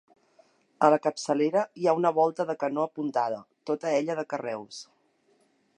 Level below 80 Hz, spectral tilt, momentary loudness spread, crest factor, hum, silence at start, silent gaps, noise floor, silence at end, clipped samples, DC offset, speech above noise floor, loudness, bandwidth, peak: -84 dBFS; -5.5 dB/octave; 12 LU; 22 dB; none; 0.8 s; none; -67 dBFS; 0.95 s; under 0.1%; under 0.1%; 41 dB; -27 LUFS; 10.5 kHz; -8 dBFS